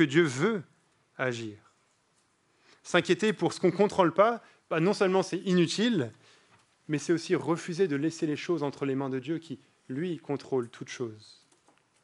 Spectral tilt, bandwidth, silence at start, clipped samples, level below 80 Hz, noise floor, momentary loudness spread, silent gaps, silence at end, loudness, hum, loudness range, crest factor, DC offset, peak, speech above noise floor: -5.5 dB/octave; 11.5 kHz; 0 s; under 0.1%; -78 dBFS; -70 dBFS; 13 LU; none; 0.85 s; -29 LUFS; none; 7 LU; 22 dB; under 0.1%; -8 dBFS; 42 dB